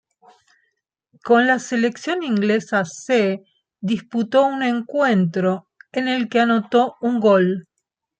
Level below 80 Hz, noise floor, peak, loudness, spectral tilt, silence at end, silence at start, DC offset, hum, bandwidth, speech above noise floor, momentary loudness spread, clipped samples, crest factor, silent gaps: -68 dBFS; -78 dBFS; -4 dBFS; -19 LUFS; -6 dB/octave; 0.6 s; 1.25 s; under 0.1%; none; 9 kHz; 60 dB; 9 LU; under 0.1%; 16 dB; none